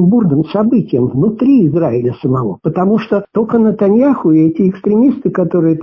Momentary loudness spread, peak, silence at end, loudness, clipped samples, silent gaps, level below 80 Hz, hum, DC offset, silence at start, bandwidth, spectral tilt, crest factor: 5 LU; -2 dBFS; 0 s; -12 LUFS; under 0.1%; none; -48 dBFS; none; under 0.1%; 0 s; 5.8 kHz; -11.5 dB/octave; 10 dB